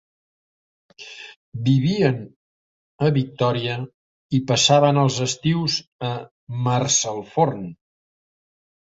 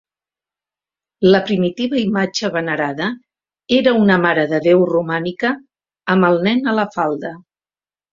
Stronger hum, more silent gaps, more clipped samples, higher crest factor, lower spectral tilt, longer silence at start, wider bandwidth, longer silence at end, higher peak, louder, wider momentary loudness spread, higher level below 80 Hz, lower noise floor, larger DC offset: neither; first, 1.36-1.52 s, 2.36-2.98 s, 3.94-4.29 s, 5.87-5.99 s, 6.31-6.47 s vs none; neither; about the same, 20 dB vs 16 dB; second, -4.5 dB/octave vs -6 dB/octave; second, 1 s vs 1.2 s; about the same, 8 kHz vs 7.4 kHz; first, 1.05 s vs 0.75 s; about the same, -2 dBFS vs -2 dBFS; second, -21 LUFS vs -16 LUFS; first, 21 LU vs 10 LU; about the same, -58 dBFS vs -58 dBFS; about the same, under -90 dBFS vs under -90 dBFS; neither